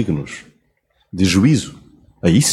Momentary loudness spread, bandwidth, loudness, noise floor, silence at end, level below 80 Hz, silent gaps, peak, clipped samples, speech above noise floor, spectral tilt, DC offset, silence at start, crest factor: 19 LU; 15 kHz; -17 LUFS; -63 dBFS; 0 s; -44 dBFS; none; -2 dBFS; under 0.1%; 48 dB; -5 dB/octave; under 0.1%; 0 s; 16 dB